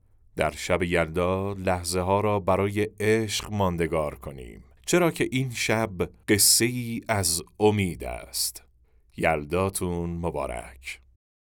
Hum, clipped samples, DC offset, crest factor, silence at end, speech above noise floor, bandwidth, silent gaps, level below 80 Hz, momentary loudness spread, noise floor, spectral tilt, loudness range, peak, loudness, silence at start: none; under 0.1%; under 0.1%; 20 dB; 0.55 s; 34 dB; over 20 kHz; none; -50 dBFS; 13 LU; -59 dBFS; -4 dB/octave; 5 LU; -6 dBFS; -25 LUFS; 0.35 s